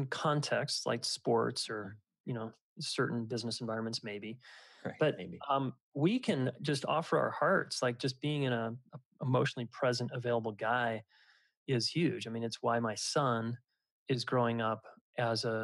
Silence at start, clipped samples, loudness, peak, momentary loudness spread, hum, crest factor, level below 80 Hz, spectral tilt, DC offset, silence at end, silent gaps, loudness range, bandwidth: 0 s; under 0.1%; -34 LUFS; -18 dBFS; 12 LU; none; 18 dB; -84 dBFS; -5 dB/octave; under 0.1%; 0 s; 2.20-2.24 s, 2.61-2.76 s, 5.80-5.92 s, 9.05-9.11 s, 11.57-11.66 s, 13.91-14.06 s, 15.01-15.13 s; 4 LU; 12.5 kHz